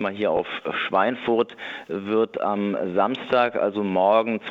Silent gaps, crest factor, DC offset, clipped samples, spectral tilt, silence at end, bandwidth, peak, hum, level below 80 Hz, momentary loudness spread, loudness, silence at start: none; 18 dB; under 0.1%; under 0.1%; -7.5 dB/octave; 0 s; 7.4 kHz; -6 dBFS; none; -66 dBFS; 8 LU; -23 LUFS; 0 s